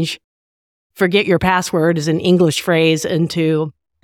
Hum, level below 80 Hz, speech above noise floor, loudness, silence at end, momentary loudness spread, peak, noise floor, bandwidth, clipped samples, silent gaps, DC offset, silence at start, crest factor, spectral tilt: none; -46 dBFS; over 75 dB; -16 LUFS; 0.35 s; 7 LU; -2 dBFS; under -90 dBFS; 17 kHz; under 0.1%; 0.24-0.90 s; under 0.1%; 0 s; 14 dB; -5.5 dB/octave